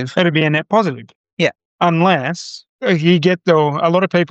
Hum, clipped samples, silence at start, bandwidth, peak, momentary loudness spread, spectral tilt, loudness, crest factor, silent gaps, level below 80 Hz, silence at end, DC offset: none; under 0.1%; 0 s; 8 kHz; -2 dBFS; 10 LU; -6.5 dB/octave; -15 LUFS; 14 dB; 1.16-1.24 s, 1.33-1.37 s, 1.65-1.79 s, 2.69-2.79 s; -64 dBFS; 0.05 s; under 0.1%